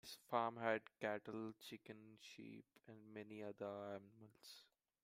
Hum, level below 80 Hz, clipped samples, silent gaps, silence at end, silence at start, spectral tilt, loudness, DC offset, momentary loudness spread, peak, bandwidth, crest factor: none; under -90 dBFS; under 0.1%; none; 0.4 s; 0.05 s; -5 dB/octave; -48 LUFS; under 0.1%; 19 LU; -26 dBFS; 16 kHz; 24 dB